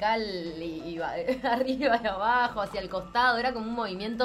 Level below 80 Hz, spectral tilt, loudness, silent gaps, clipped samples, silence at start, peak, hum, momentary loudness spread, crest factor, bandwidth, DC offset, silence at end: -54 dBFS; -5 dB/octave; -28 LUFS; none; under 0.1%; 0 s; -12 dBFS; none; 10 LU; 16 dB; 14.5 kHz; under 0.1%; 0 s